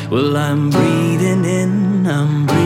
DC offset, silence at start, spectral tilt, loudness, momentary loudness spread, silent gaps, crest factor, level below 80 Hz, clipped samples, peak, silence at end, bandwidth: under 0.1%; 0 s; -6.5 dB/octave; -15 LUFS; 2 LU; none; 12 dB; -52 dBFS; under 0.1%; -2 dBFS; 0 s; 15.5 kHz